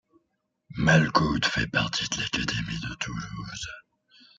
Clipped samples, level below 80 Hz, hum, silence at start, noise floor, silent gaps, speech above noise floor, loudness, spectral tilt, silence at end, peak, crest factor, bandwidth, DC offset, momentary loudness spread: under 0.1%; -48 dBFS; none; 0.7 s; -77 dBFS; none; 51 dB; -26 LUFS; -4.5 dB/octave; 0.6 s; -6 dBFS; 22 dB; 7.8 kHz; under 0.1%; 16 LU